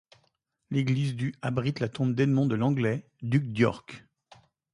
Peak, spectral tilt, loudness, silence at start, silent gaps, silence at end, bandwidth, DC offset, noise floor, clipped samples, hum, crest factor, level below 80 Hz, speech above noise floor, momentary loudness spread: -10 dBFS; -8 dB/octave; -28 LUFS; 0.7 s; none; 0.75 s; 11 kHz; under 0.1%; -74 dBFS; under 0.1%; none; 18 dB; -62 dBFS; 47 dB; 9 LU